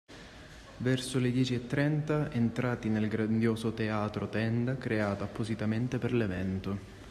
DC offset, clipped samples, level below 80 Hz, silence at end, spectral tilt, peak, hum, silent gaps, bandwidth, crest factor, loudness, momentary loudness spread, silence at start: under 0.1%; under 0.1%; -56 dBFS; 0 s; -7 dB/octave; -16 dBFS; none; none; 13 kHz; 16 dB; -32 LUFS; 8 LU; 0.1 s